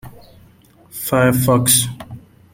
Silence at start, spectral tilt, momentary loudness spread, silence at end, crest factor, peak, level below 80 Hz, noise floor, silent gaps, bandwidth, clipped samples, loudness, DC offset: 0.05 s; -4 dB/octave; 22 LU; 0.35 s; 18 dB; 0 dBFS; -46 dBFS; -49 dBFS; none; 16.5 kHz; under 0.1%; -15 LUFS; under 0.1%